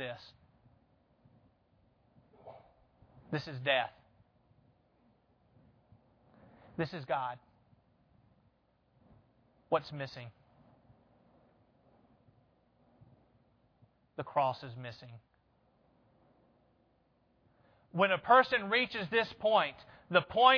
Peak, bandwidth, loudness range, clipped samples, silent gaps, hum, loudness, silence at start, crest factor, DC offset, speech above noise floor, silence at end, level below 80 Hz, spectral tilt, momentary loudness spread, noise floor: -10 dBFS; 5.4 kHz; 17 LU; under 0.1%; none; none; -32 LUFS; 0 s; 28 dB; under 0.1%; 41 dB; 0 s; -74 dBFS; -2 dB/octave; 26 LU; -72 dBFS